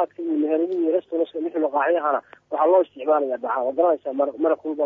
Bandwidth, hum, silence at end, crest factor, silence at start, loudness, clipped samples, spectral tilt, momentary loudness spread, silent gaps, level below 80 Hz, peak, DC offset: 3.9 kHz; none; 0 s; 14 dB; 0 s; -22 LUFS; under 0.1%; -7.5 dB/octave; 6 LU; none; -80 dBFS; -6 dBFS; under 0.1%